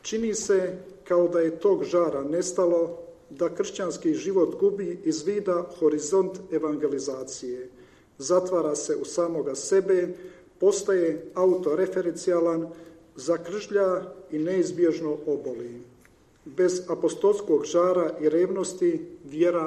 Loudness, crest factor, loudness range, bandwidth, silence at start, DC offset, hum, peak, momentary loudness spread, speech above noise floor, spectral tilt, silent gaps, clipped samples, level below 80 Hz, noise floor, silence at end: -26 LUFS; 16 dB; 3 LU; 10 kHz; 0.05 s; under 0.1%; none; -10 dBFS; 11 LU; 32 dB; -5 dB/octave; none; under 0.1%; -66 dBFS; -57 dBFS; 0 s